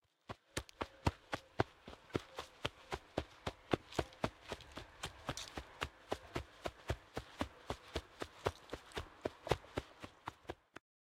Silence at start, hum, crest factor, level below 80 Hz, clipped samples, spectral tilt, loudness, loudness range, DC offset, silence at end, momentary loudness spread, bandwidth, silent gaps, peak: 0.3 s; none; 30 dB; -58 dBFS; under 0.1%; -5 dB/octave; -45 LUFS; 3 LU; under 0.1%; 0.45 s; 11 LU; 16 kHz; none; -14 dBFS